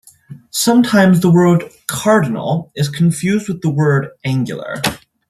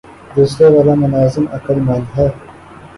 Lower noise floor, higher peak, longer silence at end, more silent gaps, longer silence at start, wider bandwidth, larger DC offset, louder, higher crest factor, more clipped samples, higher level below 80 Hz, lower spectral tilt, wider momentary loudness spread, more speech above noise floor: about the same, -38 dBFS vs -36 dBFS; about the same, 0 dBFS vs 0 dBFS; first, 0.3 s vs 0.1 s; neither; about the same, 0.3 s vs 0.3 s; first, 14 kHz vs 11.5 kHz; neither; about the same, -15 LUFS vs -13 LUFS; about the same, 14 dB vs 14 dB; neither; second, -52 dBFS vs -38 dBFS; second, -6 dB/octave vs -8.5 dB/octave; about the same, 10 LU vs 10 LU; about the same, 24 dB vs 24 dB